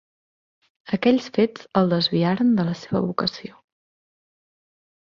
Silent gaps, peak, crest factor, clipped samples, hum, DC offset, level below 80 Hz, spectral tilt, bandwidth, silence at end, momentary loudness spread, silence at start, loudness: none; -4 dBFS; 18 dB; under 0.1%; none; under 0.1%; -62 dBFS; -7 dB/octave; 7.4 kHz; 1.55 s; 8 LU; 0.9 s; -22 LUFS